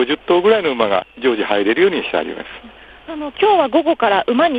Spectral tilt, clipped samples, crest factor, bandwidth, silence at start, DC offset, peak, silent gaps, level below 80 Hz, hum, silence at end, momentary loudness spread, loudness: -7 dB/octave; under 0.1%; 16 dB; 5 kHz; 0 s; under 0.1%; 0 dBFS; none; -52 dBFS; none; 0 s; 15 LU; -16 LUFS